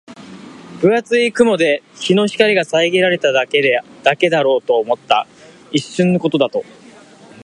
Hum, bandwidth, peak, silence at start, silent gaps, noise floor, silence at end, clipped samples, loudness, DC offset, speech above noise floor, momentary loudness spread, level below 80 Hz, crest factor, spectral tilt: none; 11 kHz; 0 dBFS; 0.1 s; none; -42 dBFS; 0.8 s; under 0.1%; -15 LUFS; under 0.1%; 27 dB; 8 LU; -62 dBFS; 16 dB; -5 dB/octave